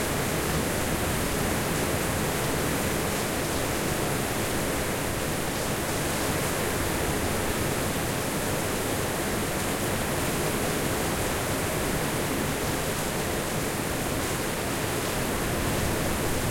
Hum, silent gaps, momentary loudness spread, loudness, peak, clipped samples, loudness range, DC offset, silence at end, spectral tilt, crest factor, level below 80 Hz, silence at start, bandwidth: none; none; 2 LU; -27 LUFS; -14 dBFS; under 0.1%; 1 LU; under 0.1%; 0 s; -4 dB/octave; 14 dB; -40 dBFS; 0 s; 16.5 kHz